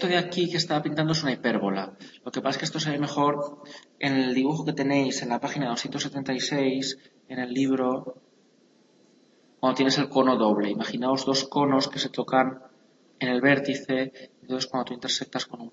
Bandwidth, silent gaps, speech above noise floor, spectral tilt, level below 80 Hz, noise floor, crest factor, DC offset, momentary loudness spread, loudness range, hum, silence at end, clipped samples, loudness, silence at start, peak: 8 kHz; none; 35 dB; -4.5 dB/octave; -72 dBFS; -61 dBFS; 20 dB; under 0.1%; 11 LU; 4 LU; none; 0.05 s; under 0.1%; -26 LUFS; 0 s; -8 dBFS